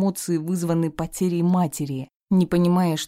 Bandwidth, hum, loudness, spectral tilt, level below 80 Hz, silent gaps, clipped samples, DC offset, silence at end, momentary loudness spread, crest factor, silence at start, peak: 16 kHz; none; -23 LUFS; -6.5 dB/octave; -52 dBFS; 2.16-2.20 s; under 0.1%; under 0.1%; 0 s; 8 LU; 12 dB; 0 s; -10 dBFS